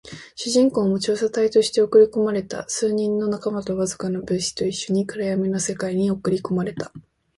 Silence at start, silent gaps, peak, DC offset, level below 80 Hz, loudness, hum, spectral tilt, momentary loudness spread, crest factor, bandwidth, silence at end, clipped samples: 0.05 s; none; -4 dBFS; under 0.1%; -56 dBFS; -22 LUFS; none; -5 dB/octave; 10 LU; 16 dB; 11.5 kHz; 0.35 s; under 0.1%